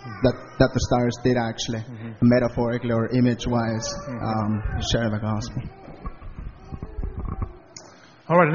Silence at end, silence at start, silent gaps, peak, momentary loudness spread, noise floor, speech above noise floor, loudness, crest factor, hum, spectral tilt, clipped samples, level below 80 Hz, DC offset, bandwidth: 0 s; 0 s; none; -2 dBFS; 20 LU; -48 dBFS; 26 dB; -24 LUFS; 22 dB; none; -6 dB/octave; under 0.1%; -38 dBFS; under 0.1%; 7.2 kHz